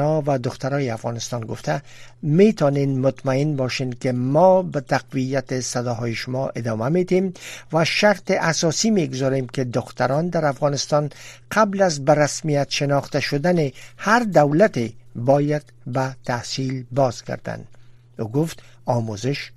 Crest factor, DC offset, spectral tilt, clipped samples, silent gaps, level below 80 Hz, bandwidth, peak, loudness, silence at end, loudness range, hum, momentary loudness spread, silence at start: 20 dB; under 0.1%; -5.5 dB/octave; under 0.1%; none; -54 dBFS; 13.5 kHz; -2 dBFS; -21 LUFS; 0.05 s; 5 LU; none; 11 LU; 0 s